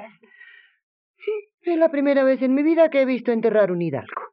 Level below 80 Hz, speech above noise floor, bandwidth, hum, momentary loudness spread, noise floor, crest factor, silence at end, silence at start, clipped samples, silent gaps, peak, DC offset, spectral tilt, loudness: -82 dBFS; 30 dB; 5.6 kHz; none; 12 LU; -49 dBFS; 16 dB; 0.05 s; 0 s; under 0.1%; 0.83-1.14 s, 1.54-1.58 s; -6 dBFS; under 0.1%; -6 dB/octave; -20 LUFS